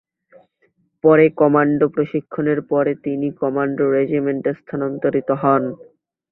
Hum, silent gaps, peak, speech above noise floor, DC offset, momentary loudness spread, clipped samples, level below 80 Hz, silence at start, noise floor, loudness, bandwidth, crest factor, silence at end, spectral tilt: none; none; -2 dBFS; 46 dB; under 0.1%; 10 LU; under 0.1%; -60 dBFS; 1.05 s; -63 dBFS; -18 LUFS; 4 kHz; 16 dB; 0.5 s; -12 dB/octave